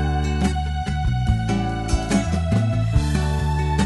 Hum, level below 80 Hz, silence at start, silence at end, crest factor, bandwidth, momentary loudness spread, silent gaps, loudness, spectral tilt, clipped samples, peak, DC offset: none; -26 dBFS; 0 s; 0 s; 14 dB; 11.5 kHz; 3 LU; none; -22 LUFS; -6.5 dB/octave; under 0.1%; -6 dBFS; under 0.1%